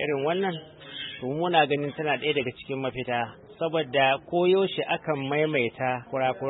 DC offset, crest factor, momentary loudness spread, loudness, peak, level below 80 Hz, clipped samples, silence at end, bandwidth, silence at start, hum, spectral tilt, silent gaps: under 0.1%; 20 dB; 10 LU; -26 LUFS; -8 dBFS; -64 dBFS; under 0.1%; 0 s; 4.1 kHz; 0 s; none; -10 dB/octave; none